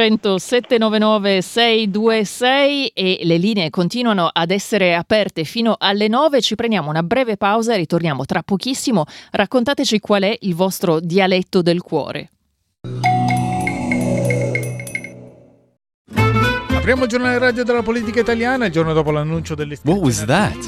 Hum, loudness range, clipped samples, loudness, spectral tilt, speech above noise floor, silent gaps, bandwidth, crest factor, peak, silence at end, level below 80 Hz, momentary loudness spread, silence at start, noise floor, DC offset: none; 4 LU; under 0.1%; -17 LUFS; -5 dB/octave; 29 dB; 15.94-16.05 s; 15 kHz; 16 dB; -2 dBFS; 0 s; -44 dBFS; 6 LU; 0 s; -46 dBFS; under 0.1%